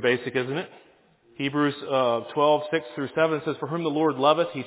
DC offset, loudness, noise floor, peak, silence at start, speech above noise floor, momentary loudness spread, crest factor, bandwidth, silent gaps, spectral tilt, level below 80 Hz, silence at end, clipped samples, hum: under 0.1%; -25 LUFS; -58 dBFS; -6 dBFS; 0 s; 34 dB; 9 LU; 20 dB; 4 kHz; none; -9.5 dB/octave; -72 dBFS; 0 s; under 0.1%; none